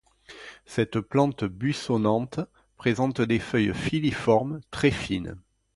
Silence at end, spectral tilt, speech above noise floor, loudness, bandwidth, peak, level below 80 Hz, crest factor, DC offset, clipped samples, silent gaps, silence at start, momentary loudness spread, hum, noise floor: 0.35 s; -6.5 dB/octave; 22 dB; -26 LUFS; 11.5 kHz; -8 dBFS; -50 dBFS; 18 dB; under 0.1%; under 0.1%; none; 0.3 s; 11 LU; none; -47 dBFS